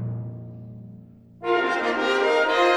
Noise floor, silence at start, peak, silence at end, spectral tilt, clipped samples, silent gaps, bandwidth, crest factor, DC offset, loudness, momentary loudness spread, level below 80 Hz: -46 dBFS; 0 s; -8 dBFS; 0 s; -5 dB/octave; under 0.1%; none; 12 kHz; 16 dB; under 0.1%; -23 LUFS; 21 LU; -60 dBFS